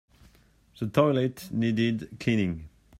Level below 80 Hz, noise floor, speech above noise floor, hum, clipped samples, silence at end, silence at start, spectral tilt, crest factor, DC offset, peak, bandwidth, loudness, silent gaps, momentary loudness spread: -56 dBFS; -60 dBFS; 34 dB; none; under 0.1%; 0.3 s; 0.8 s; -7 dB/octave; 20 dB; under 0.1%; -8 dBFS; 15.5 kHz; -27 LUFS; none; 8 LU